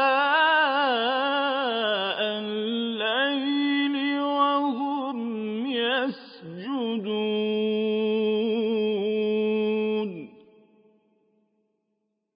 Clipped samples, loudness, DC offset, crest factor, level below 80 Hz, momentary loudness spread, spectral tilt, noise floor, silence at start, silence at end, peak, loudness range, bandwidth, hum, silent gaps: under 0.1%; -25 LUFS; under 0.1%; 16 dB; -82 dBFS; 9 LU; -9 dB/octave; -77 dBFS; 0 s; 2.05 s; -10 dBFS; 4 LU; 5.2 kHz; none; none